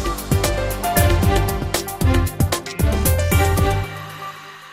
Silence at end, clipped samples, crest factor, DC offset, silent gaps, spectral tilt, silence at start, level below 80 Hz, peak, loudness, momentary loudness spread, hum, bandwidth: 0 s; under 0.1%; 16 dB; under 0.1%; none; -5 dB/octave; 0 s; -26 dBFS; -4 dBFS; -19 LUFS; 14 LU; none; 16 kHz